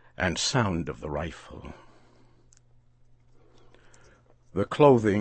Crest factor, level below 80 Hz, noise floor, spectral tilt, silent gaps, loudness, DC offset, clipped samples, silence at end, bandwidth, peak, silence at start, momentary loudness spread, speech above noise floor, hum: 24 dB; -52 dBFS; -58 dBFS; -5 dB/octave; none; -25 LUFS; under 0.1%; under 0.1%; 0 s; 8.8 kHz; -4 dBFS; 0.2 s; 25 LU; 33 dB; none